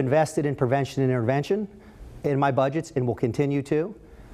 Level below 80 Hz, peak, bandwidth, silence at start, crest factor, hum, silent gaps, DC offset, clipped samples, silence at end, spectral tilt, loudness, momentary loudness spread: -52 dBFS; -8 dBFS; 14 kHz; 0 s; 16 dB; none; none; under 0.1%; under 0.1%; 0 s; -7.5 dB/octave; -25 LUFS; 6 LU